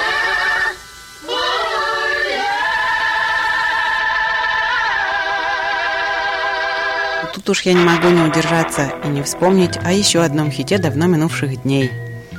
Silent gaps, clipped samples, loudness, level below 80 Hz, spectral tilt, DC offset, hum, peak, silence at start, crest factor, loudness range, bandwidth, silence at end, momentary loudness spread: none; under 0.1%; -16 LUFS; -46 dBFS; -4 dB/octave; under 0.1%; none; 0 dBFS; 0 s; 16 dB; 3 LU; 16.5 kHz; 0 s; 7 LU